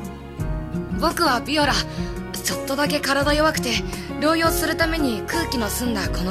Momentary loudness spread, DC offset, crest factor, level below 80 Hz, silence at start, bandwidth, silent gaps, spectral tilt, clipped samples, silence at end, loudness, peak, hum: 10 LU; under 0.1%; 16 dB; -34 dBFS; 0 s; 15 kHz; none; -4 dB/octave; under 0.1%; 0 s; -22 LUFS; -6 dBFS; none